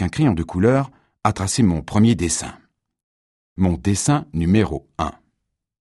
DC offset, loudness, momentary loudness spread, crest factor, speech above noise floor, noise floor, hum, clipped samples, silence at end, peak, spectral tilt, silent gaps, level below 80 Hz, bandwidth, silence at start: under 0.1%; -20 LUFS; 10 LU; 20 dB; 57 dB; -76 dBFS; none; under 0.1%; 0.75 s; -2 dBFS; -5.5 dB/octave; 3.04-3.56 s; -40 dBFS; 12 kHz; 0 s